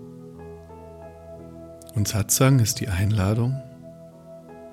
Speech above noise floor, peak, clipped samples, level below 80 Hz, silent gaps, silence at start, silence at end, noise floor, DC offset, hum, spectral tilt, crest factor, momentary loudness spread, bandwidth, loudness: 23 dB; -8 dBFS; under 0.1%; -54 dBFS; none; 0 s; 0 s; -44 dBFS; under 0.1%; none; -5 dB/octave; 18 dB; 25 LU; 16.5 kHz; -22 LUFS